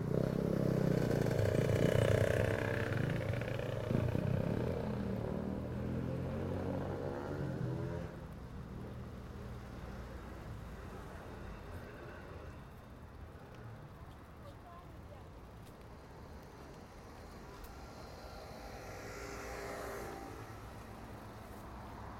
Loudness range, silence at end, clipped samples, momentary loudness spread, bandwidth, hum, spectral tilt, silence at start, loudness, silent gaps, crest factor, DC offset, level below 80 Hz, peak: 19 LU; 0 s; under 0.1%; 19 LU; 16.5 kHz; none; -7 dB/octave; 0 s; -39 LUFS; none; 22 dB; under 0.1%; -54 dBFS; -16 dBFS